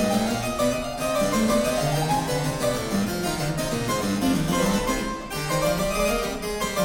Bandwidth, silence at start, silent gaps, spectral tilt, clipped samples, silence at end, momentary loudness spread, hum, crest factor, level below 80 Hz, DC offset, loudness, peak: 17 kHz; 0 s; none; -4.5 dB/octave; under 0.1%; 0 s; 4 LU; none; 14 dB; -40 dBFS; under 0.1%; -24 LUFS; -10 dBFS